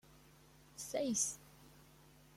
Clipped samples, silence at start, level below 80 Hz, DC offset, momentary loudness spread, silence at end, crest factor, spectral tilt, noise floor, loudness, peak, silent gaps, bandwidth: under 0.1%; 0.1 s; -72 dBFS; under 0.1%; 26 LU; 0.25 s; 24 dB; -2.5 dB/octave; -64 dBFS; -38 LUFS; -22 dBFS; none; 16.5 kHz